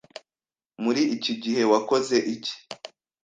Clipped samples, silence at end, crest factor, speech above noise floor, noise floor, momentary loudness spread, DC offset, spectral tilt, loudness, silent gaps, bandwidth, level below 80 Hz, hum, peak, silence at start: under 0.1%; 0.35 s; 20 dB; over 66 dB; under -90 dBFS; 21 LU; under 0.1%; -4 dB/octave; -24 LUFS; none; 9.4 kHz; -70 dBFS; none; -6 dBFS; 0.8 s